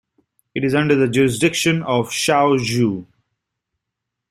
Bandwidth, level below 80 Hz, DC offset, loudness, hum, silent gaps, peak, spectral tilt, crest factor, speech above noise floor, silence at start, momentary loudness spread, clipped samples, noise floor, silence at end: 16 kHz; -54 dBFS; under 0.1%; -17 LUFS; none; none; -2 dBFS; -5 dB/octave; 18 dB; 64 dB; 0.55 s; 7 LU; under 0.1%; -81 dBFS; 1.3 s